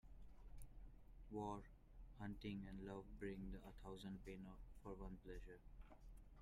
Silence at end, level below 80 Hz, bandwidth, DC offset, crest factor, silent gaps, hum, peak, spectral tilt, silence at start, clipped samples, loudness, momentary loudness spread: 0 s; -62 dBFS; 15 kHz; under 0.1%; 18 dB; none; none; -38 dBFS; -7 dB/octave; 0.05 s; under 0.1%; -56 LUFS; 15 LU